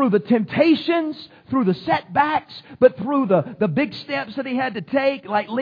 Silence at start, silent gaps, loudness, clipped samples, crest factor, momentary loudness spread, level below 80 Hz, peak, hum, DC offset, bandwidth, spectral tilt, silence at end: 0 s; none; -21 LUFS; under 0.1%; 18 dB; 8 LU; -62 dBFS; -2 dBFS; none; under 0.1%; 5.2 kHz; -8.5 dB/octave; 0 s